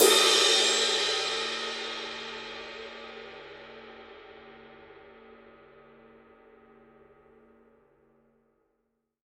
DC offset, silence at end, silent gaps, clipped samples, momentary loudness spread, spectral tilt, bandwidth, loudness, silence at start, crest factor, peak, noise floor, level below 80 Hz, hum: under 0.1%; 4.3 s; none; under 0.1%; 28 LU; 0.5 dB/octave; 15 kHz; -24 LUFS; 0 s; 24 dB; -8 dBFS; -79 dBFS; -70 dBFS; none